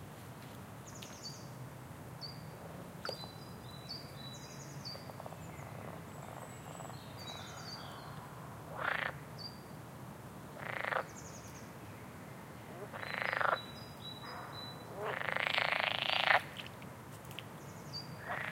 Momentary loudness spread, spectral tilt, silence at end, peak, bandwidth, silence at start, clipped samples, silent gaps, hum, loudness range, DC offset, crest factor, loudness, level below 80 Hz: 17 LU; -3.5 dB/octave; 0 s; -10 dBFS; 16.5 kHz; 0 s; under 0.1%; none; none; 12 LU; under 0.1%; 32 dB; -41 LUFS; -68 dBFS